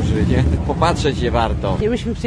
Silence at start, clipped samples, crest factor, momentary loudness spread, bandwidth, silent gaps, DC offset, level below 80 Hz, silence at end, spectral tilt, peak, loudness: 0 s; under 0.1%; 16 dB; 3 LU; 10.5 kHz; none; under 0.1%; -24 dBFS; 0 s; -6.5 dB/octave; 0 dBFS; -18 LUFS